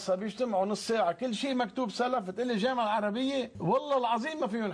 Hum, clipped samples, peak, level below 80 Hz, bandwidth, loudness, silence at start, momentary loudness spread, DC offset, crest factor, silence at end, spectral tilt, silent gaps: none; under 0.1%; -18 dBFS; -70 dBFS; 11 kHz; -30 LUFS; 0 s; 4 LU; under 0.1%; 12 dB; 0 s; -5 dB/octave; none